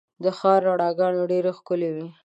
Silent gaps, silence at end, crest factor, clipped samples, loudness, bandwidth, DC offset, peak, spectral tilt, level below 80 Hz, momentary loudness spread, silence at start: none; 0.15 s; 16 dB; under 0.1%; -23 LUFS; 8.2 kHz; under 0.1%; -6 dBFS; -7.5 dB/octave; -80 dBFS; 7 LU; 0.2 s